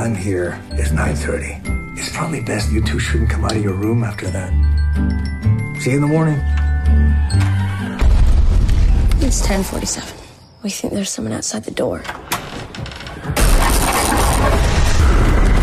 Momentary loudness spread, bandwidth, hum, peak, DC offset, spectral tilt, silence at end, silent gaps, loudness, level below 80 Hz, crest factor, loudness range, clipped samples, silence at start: 9 LU; 15.5 kHz; none; -4 dBFS; under 0.1%; -5 dB/octave; 0 s; none; -18 LUFS; -18 dBFS; 12 dB; 5 LU; under 0.1%; 0 s